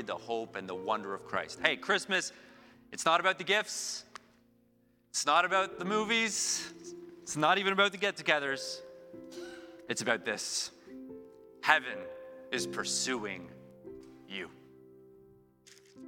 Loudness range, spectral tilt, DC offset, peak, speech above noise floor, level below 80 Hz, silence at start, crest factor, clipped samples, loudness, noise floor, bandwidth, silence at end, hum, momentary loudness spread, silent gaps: 7 LU; -2 dB/octave; under 0.1%; -6 dBFS; 36 dB; -74 dBFS; 0 s; 28 dB; under 0.1%; -31 LUFS; -68 dBFS; 17 kHz; 0 s; none; 21 LU; none